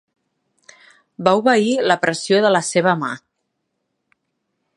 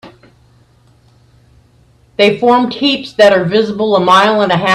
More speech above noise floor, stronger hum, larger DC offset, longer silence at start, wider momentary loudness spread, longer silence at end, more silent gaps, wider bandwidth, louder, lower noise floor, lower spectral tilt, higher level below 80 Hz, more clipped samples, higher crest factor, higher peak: first, 58 dB vs 38 dB; neither; neither; first, 1.2 s vs 0.05 s; about the same, 7 LU vs 6 LU; first, 1.6 s vs 0 s; neither; second, 11.5 kHz vs 13 kHz; second, -17 LUFS vs -11 LUFS; first, -74 dBFS vs -49 dBFS; about the same, -4 dB/octave vs -5 dB/octave; second, -68 dBFS vs -52 dBFS; neither; first, 20 dB vs 12 dB; about the same, 0 dBFS vs 0 dBFS